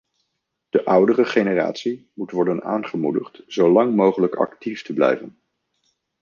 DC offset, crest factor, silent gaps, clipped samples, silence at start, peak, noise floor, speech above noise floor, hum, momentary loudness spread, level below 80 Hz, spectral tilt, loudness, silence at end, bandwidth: under 0.1%; 18 dB; none; under 0.1%; 0.75 s; -2 dBFS; -77 dBFS; 57 dB; none; 12 LU; -68 dBFS; -7 dB/octave; -20 LUFS; 0.9 s; 7.2 kHz